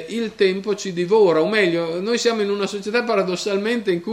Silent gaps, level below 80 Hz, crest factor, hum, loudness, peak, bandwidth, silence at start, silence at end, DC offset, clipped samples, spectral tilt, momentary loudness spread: none; -66 dBFS; 14 dB; none; -20 LUFS; -6 dBFS; 12.5 kHz; 0 s; 0 s; under 0.1%; under 0.1%; -4.5 dB/octave; 8 LU